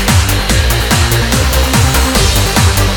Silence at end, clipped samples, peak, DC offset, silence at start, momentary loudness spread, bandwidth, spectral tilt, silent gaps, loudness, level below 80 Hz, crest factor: 0 s; under 0.1%; 0 dBFS; under 0.1%; 0 s; 2 LU; 19 kHz; -3.5 dB/octave; none; -10 LUFS; -16 dBFS; 10 dB